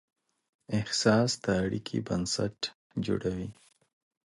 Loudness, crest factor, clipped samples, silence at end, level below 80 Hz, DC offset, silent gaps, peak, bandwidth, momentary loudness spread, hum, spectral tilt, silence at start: -30 LUFS; 20 dB; under 0.1%; 0.85 s; -56 dBFS; under 0.1%; 2.75-2.90 s; -10 dBFS; 11.5 kHz; 11 LU; none; -4.5 dB/octave; 0.7 s